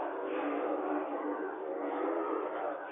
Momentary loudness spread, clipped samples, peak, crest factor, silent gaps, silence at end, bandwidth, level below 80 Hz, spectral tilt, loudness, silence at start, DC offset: 4 LU; under 0.1%; -22 dBFS; 14 dB; none; 0 s; 3.7 kHz; -90 dBFS; 2 dB/octave; -36 LUFS; 0 s; under 0.1%